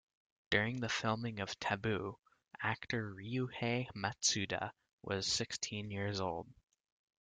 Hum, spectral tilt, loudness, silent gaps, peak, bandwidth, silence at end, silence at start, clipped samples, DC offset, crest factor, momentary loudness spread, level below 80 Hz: none; -3.5 dB/octave; -38 LUFS; 4.93-4.98 s; -16 dBFS; 10 kHz; 0.7 s; 0.5 s; under 0.1%; under 0.1%; 24 dB; 8 LU; -68 dBFS